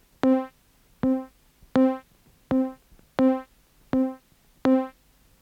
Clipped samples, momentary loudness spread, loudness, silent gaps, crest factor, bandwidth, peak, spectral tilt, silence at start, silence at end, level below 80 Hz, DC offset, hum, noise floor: under 0.1%; 13 LU; -26 LUFS; none; 20 dB; 6.6 kHz; -8 dBFS; -8 dB/octave; 0.25 s; 0.5 s; -58 dBFS; under 0.1%; none; -60 dBFS